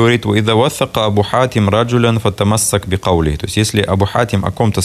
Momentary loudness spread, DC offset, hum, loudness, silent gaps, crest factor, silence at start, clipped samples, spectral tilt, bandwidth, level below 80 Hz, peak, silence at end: 3 LU; under 0.1%; none; -14 LUFS; none; 14 dB; 0 s; under 0.1%; -5 dB/octave; 14 kHz; -36 dBFS; 0 dBFS; 0 s